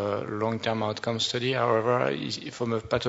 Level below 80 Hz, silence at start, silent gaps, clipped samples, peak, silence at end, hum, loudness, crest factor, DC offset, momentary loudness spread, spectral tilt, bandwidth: -58 dBFS; 0 s; none; under 0.1%; -10 dBFS; 0 s; none; -27 LUFS; 18 dB; under 0.1%; 7 LU; -5 dB/octave; 8 kHz